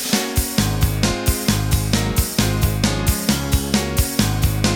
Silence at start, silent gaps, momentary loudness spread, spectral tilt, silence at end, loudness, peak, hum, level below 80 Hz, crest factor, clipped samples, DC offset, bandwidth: 0 s; none; 1 LU; -4.5 dB/octave; 0 s; -19 LUFS; -2 dBFS; none; -26 dBFS; 16 dB; under 0.1%; under 0.1%; over 20 kHz